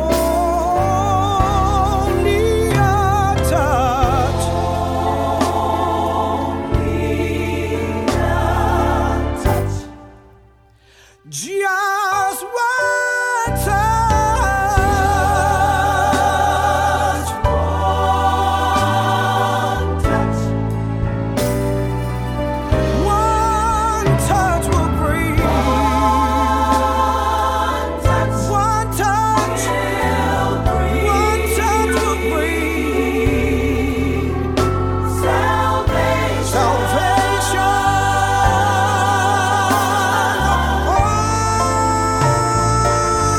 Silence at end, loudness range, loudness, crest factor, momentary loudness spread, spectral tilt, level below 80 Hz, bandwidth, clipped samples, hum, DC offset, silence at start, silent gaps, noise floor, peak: 0 s; 4 LU; -17 LUFS; 16 dB; 4 LU; -5 dB/octave; -26 dBFS; 18.5 kHz; under 0.1%; none; under 0.1%; 0 s; none; -50 dBFS; 0 dBFS